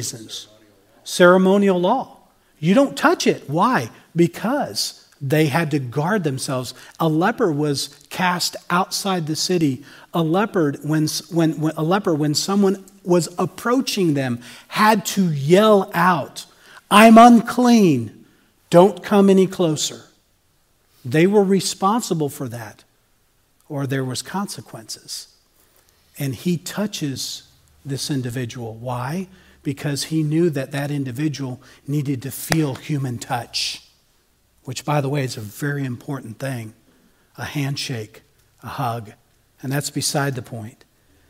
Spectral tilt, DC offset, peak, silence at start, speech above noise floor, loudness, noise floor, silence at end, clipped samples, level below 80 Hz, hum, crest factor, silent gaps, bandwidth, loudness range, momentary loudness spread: -5 dB/octave; under 0.1%; 0 dBFS; 0 s; 42 dB; -19 LUFS; -61 dBFS; 0.6 s; under 0.1%; -60 dBFS; none; 20 dB; none; 16 kHz; 14 LU; 18 LU